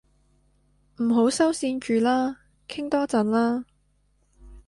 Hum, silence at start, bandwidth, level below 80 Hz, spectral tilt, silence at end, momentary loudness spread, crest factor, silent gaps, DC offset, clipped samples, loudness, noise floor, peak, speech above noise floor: 50 Hz at -60 dBFS; 1 s; 11.5 kHz; -58 dBFS; -4.5 dB/octave; 0.05 s; 11 LU; 16 dB; none; under 0.1%; under 0.1%; -24 LUFS; -66 dBFS; -10 dBFS; 43 dB